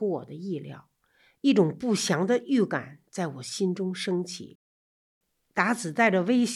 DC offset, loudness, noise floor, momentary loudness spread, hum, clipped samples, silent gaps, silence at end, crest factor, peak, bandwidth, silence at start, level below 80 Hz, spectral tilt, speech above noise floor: under 0.1%; -27 LUFS; -65 dBFS; 13 LU; none; under 0.1%; 4.55-5.21 s; 0 s; 20 dB; -6 dBFS; 13 kHz; 0 s; -76 dBFS; -5 dB/octave; 39 dB